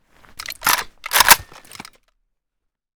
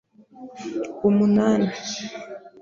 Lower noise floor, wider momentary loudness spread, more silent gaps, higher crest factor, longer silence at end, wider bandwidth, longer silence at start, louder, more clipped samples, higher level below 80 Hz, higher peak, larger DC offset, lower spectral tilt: first, -77 dBFS vs -44 dBFS; about the same, 19 LU vs 19 LU; neither; first, 22 dB vs 16 dB; first, 1.55 s vs 0.15 s; first, over 20 kHz vs 7.4 kHz; first, 0.5 s vs 0.35 s; first, -15 LUFS vs -22 LUFS; first, 0.1% vs under 0.1%; first, -48 dBFS vs -62 dBFS; first, 0 dBFS vs -6 dBFS; neither; second, 1 dB/octave vs -6 dB/octave